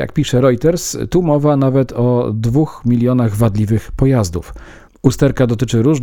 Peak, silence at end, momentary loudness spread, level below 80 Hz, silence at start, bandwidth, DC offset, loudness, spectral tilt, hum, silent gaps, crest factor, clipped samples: 0 dBFS; 0 s; 5 LU; -34 dBFS; 0 s; 18.5 kHz; under 0.1%; -15 LUFS; -7 dB/octave; none; none; 14 dB; under 0.1%